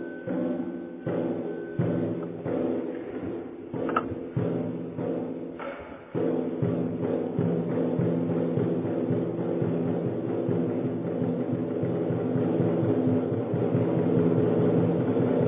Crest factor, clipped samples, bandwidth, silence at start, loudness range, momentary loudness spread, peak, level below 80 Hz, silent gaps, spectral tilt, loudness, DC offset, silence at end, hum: 18 dB; under 0.1%; 3.8 kHz; 0 s; 6 LU; 10 LU; -10 dBFS; -60 dBFS; none; -9.5 dB/octave; -28 LUFS; under 0.1%; 0 s; none